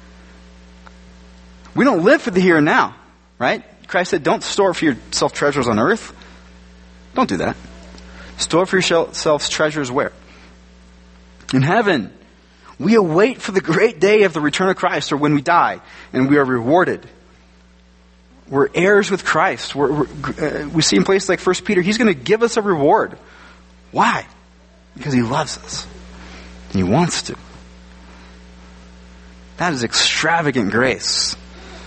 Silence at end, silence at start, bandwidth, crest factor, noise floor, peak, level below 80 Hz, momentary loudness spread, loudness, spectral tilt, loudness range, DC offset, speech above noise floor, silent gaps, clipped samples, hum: 0 s; 1.75 s; 8.8 kHz; 18 dB; -49 dBFS; 0 dBFS; -46 dBFS; 12 LU; -17 LUFS; -4.5 dB/octave; 6 LU; under 0.1%; 32 dB; none; under 0.1%; none